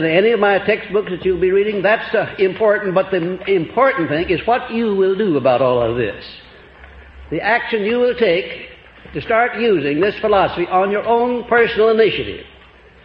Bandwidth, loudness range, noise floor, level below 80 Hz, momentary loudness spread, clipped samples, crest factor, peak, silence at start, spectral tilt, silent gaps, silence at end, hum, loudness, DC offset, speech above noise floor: 5.6 kHz; 3 LU; -44 dBFS; -46 dBFS; 9 LU; under 0.1%; 16 dB; -2 dBFS; 0 s; -9 dB/octave; none; 0.55 s; none; -16 LUFS; under 0.1%; 28 dB